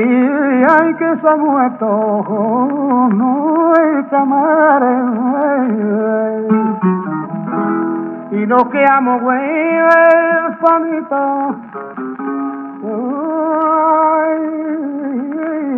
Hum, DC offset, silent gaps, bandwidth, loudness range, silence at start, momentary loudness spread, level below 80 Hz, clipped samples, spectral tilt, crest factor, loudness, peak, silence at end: none; under 0.1%; none; 4.8 kHz; 4 LU; 0 s; 11 LU; -68 dBFS; under 0.1%; -9.5 dB/octave; 14 dB; -14 LUFS; 0 dBFS; 0 s